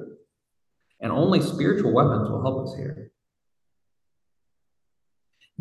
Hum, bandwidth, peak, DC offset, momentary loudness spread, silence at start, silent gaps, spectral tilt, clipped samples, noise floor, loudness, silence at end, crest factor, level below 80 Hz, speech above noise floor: none; 12.5 kHz; -6 dBFS; under 0.1%; 19 LU; 0 s; none; -7.5 dB/octave; under 0.1%; -85 dBFS; -23 LUFS; 2.55 s; 22 dB; -54 dBFS; 62 dB